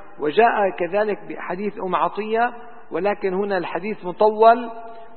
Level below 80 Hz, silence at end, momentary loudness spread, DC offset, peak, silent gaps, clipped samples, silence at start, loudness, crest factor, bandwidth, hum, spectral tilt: -64 dBFS; 0.1 s; 14 LU; 1%; 0 dBFS; none; under 0.1%; 0 s; -21 LUFS; 20 dB; 4.4 kHz; none; -10 dB/octave